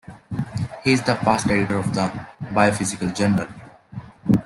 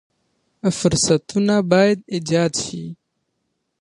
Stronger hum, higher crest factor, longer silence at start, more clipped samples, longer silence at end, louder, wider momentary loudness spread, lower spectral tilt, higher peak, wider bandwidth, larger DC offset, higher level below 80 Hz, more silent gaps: neither; about the same, 18 dB vs 18 dB; second, 0.1 s vs 0.65 s; neither; second, 0 s vs 0.85 s; second, -22 LUFS vs -19 LUFS; first, 15 LU vs 11 LU; about the same, -5.5 dB/octave vs -4.5 dB/octave; about the same, -4 dBFS vs -2 dBFS; about the same, 12.5 kHz vs 11.5 kHz; neither; about the same, -50 dBFS vs -50 dBFS; neither